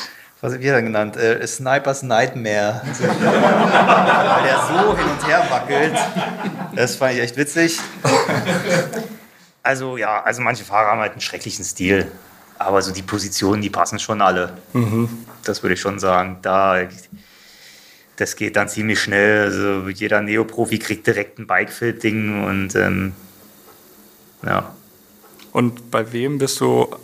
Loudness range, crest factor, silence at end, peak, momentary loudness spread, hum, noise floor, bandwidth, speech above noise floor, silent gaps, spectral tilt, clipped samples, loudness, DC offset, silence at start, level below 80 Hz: 7 LU; 18 dB; 0 s; 0 dBFS; 10 LU; none; -48 dBFS; 15.5 kHz; 30 dB; none; -4.5 dB/octave; under 0.1%; -18 LUFS; under 0.1%; 0 s; -52 dBFS